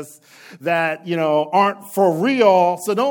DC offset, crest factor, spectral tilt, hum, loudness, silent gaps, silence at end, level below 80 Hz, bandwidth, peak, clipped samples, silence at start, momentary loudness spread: under 0.1%; 16 dB; -5.5 dB/octave; none; -17 LUFS; none; 0 s; -78 dBFS; 17.5 kHz; -2 dBFS; under 0.1%; 0 s; 8 LU